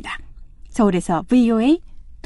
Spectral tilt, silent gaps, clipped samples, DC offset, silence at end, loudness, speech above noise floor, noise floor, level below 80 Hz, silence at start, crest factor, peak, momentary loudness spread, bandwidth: -6.5 dB/octave; none; under 0.1%; under 0.1%; 0.1 s; -18 LUFS; 22 dB; -38 dBFS; -40 dBFS; 0 s; 16 dB; -4 dBFS; 15 LU; 11.5 kHz